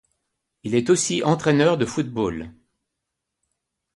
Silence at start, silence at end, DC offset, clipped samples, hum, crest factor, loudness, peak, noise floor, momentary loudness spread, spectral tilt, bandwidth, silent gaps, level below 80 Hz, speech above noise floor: 0.65 s; 1.45 s; under 0.1%; under 0.1%; none; 18 dB; -21 LUFS; -6 dBFS; -81 dBFS; 16 LU; -5 dB/octave; 11.5 kHz; none; -54 dBFS; 61 dB